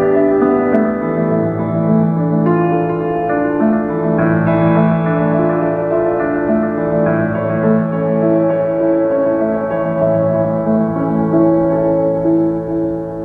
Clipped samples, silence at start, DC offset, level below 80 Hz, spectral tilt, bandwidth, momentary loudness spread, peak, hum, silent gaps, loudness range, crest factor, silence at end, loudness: under 0.1%; 0 s; under 0.1%; -44 dBFS; -11.5 dB/octave; 3.8 kHz; 4 LU; 0 dBFS; none; none; 1 LU; 14 dB; 0 s; -15 LUFS